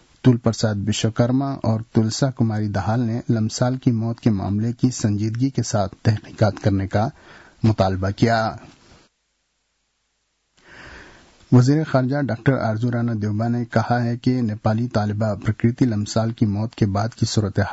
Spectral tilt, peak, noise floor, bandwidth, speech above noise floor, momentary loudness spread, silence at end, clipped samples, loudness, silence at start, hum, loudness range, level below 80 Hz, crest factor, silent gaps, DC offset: -6.5 dB/octave; -6 dBFS; -71 dBFS; 8 kHz; 51 dB; 4 LU; 0 s; under 0.1%; -21 LUFS; 0.25 s; none; 4 LU; -52 dBFS; 16 dB; none; under 0.1%